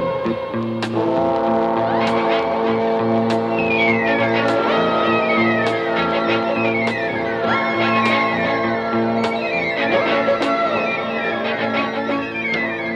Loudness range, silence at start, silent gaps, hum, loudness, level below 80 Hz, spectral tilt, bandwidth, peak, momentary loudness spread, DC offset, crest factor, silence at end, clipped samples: 2 LU; 0 s; none; none; -18 LUFS; -54 dBFS; -6 dB/octave; 10 kHz; -4 dBFS; 5 LU; under 0.1%; 14 dB; 0 s; under 0.1%